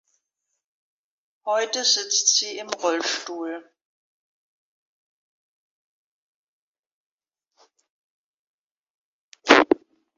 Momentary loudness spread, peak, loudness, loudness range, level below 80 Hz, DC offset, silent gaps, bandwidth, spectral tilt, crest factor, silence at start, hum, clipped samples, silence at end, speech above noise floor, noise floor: 17 LU; 0 dBFS; -21 LUFS; 16 LU; -70 dBFS; under 0.1%; 3.85-6.83 s, 6.92-7.18 s, 7.90-8.83 s, 8.90-9.32 s; 9.4 kHz; 0 dB/octave; 28 dB; 1.45 s; none; under 0.1%; 0.4 s; 56 dB; -80 dBFS